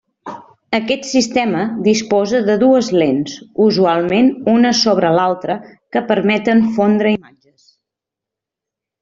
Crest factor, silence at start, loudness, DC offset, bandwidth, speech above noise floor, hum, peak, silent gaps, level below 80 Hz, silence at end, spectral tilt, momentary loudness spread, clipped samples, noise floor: 14 dB; 0.25 s; -15 LUFS; under 0.1%; 7.8 kHz; 70 dB; none; -2 dBFS; none; -56 dBFS; 1.85 s; -5 dB/octave; 10 LU; under 0.1%; -84 dBFS